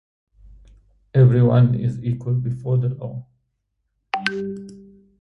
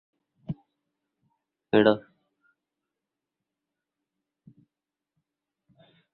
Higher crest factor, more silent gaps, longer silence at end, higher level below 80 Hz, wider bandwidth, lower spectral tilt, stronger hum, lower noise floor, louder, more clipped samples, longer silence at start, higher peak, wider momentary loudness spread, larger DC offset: second, 20 dB vs 26 dB; neither; second, 0.4 s vs 4.15 s; first, -50 dBFS vs -68 dBFS; first, 6 kHz vs 4.5 kHz; first, -9 dB/octave vs -4.5 dB/octave; neither; second, -74 dBFS vs -88 dBFS; first, -20 LUFS vs -24 LUFS; neither; first, 1.15 s vs 0.5 s; first, -2 dBFS vs -6 dBFS; about the same, 18 LU vs 19 LU; neither